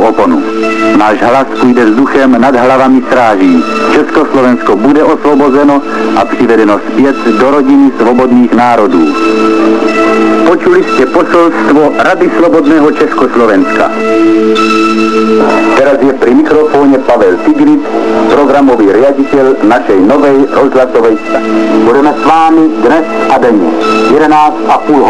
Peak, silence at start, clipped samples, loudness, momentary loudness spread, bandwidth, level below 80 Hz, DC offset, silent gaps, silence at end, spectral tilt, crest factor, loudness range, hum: 0 dBFS; 0 s; 0.9%; -6 LUFS; 3 LU; 11 kHz; -40 dBFS; 6%; none; 0 s; -6 dB/octave; 6 dB; 1 LU; none